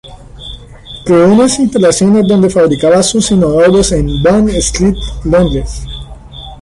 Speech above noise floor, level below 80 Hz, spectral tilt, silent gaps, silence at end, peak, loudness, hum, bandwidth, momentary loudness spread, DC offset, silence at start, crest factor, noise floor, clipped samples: 22 dB; -24 dBFS; -5 dB/octave; none; 0.05 s; 0 dBFS; -9 LUFS; none; 11.5 kHz; 20 LU; under 0.1%; 0.05 s; 10 dB; -31 dBFS; under 0.1%